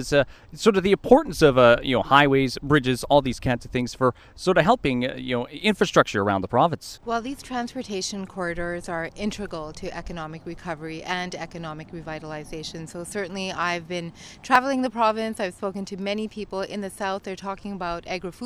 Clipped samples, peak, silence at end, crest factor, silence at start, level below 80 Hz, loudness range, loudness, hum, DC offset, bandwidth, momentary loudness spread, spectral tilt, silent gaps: under 0.1%; -2 dBFS; 0 s; 22 dB; 0 s; -46 dBFS; 13 LU; -24 LUFS; none; under 0.1%; 15.5 kHz; 16 LU; -5 dB/octave; none